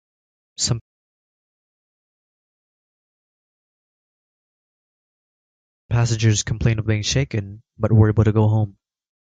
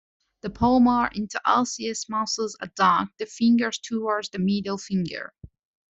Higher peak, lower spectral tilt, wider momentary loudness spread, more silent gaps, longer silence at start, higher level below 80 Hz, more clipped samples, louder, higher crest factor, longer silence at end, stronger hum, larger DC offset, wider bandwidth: about the same, -4 dBFS vs -6 dBFS; about the same, -5.5 dB/octave vs -4.5 dB/octave; about the same, 11 LU vs 12 LU; first, 0.81-5.89 s vs none; first, 0.6 s vs 0.45 s; first, -40 dBFS vs -54 dBFS; neither; first, -20 LUFS vs -24 LUFS; about the same, 20 dB vs 18 dB; first, 0.6 s vs 0.45 s; neither; neither; first, 9.2 kHz vs 8.2 kHz